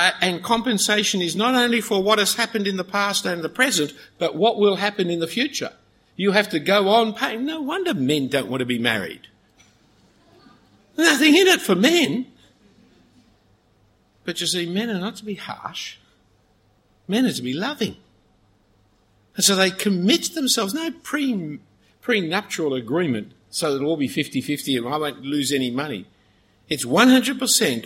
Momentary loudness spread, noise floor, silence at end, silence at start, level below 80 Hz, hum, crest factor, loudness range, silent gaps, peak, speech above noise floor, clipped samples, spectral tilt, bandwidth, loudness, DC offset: 13 LU; -61 dBFS; 0 s; 0 s; -64 dBFS; none; 20 dB; 9 LU; none; -2 dBFS; 40 dB; under 0.1%; -3 dB/octave; 16.5 kHz; -20 LUFS; under 0.1%